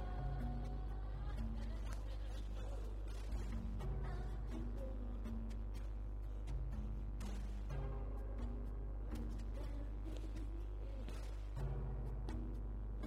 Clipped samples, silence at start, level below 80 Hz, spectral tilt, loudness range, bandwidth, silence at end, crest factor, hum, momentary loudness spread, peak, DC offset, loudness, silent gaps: under 0.1%; 0 s; -44 dBFS; -7.5 dB/octave; 1 LU; 9.2 kHz; 0 s; 12 dB; none; 3 LU; -32 dBFS; under 0.1%; -47 LUFS; none